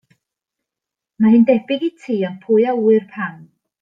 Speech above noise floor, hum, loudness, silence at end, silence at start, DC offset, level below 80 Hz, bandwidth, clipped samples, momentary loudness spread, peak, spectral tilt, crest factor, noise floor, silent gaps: 69 dB; none; -17 LUFS; 0.4 s; 1.2 s; under 0.1%; -66 dBFS; 5 kHz; under 0.1%; 13 LU; -2 dBFS; -8.5 dB/octave; 16 dB; -85 dBFS; none